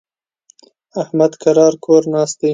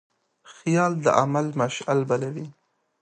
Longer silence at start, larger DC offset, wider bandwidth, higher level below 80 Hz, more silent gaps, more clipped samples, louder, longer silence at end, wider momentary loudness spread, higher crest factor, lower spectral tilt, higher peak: first, 0.95 s vs 0.5 s; neither; about the same, 9.2 kHz vs 9.6 kHz; about the same, -66 dBFS vs -68 dBFS; neither; neither; first, -14 LUFS vs -24 LUFS; second, 0 s vs 0.5 s; about the same, 11 LU vs 12 LU; second, 16 dB vs 22 dB; about the same, -6 dB/octave vs -6 dB/octave; about the same, 0 dBFS vs -2 dBFS